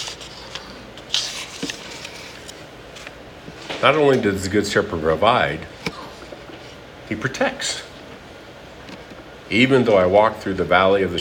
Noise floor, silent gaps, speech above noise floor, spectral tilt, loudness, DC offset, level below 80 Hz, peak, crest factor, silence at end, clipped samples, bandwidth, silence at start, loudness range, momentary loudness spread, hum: -40 dBFS; none; 22 dB; -4.5 dB/octave; -19 LUFS; under 0.1%; -50 dBFS; 0 dBFS; 20 dB; 0 s; under 0.1%; 17.5 kHz; 0 s; 9 LU; 23 LU; none